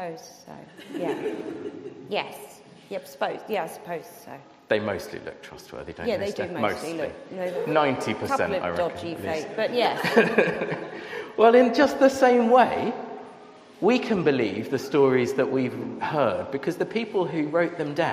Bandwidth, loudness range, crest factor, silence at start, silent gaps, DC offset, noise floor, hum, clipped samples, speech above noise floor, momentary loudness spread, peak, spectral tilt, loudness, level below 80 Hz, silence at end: 15.5 kHz; 11 LU; 22 dB; 0 s; none; under 0.1%; -47 dBFS; none; under 0.1%; 23 dB; 20 LU; -4 dBFS; -5.5 dB/octave; -24 LUFS; -62 dBFS; 0 s